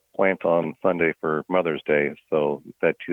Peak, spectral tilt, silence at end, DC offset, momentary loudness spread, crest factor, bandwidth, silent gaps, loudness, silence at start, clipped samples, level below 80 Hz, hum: -6 dBFS; -8.5 dB/octave; 0 s; under 0.1%; 3 LU; 18 dB; 3.9 kHz; none; -23 LUFS; 0.2 s; under 0.1%; -64 dBFS; none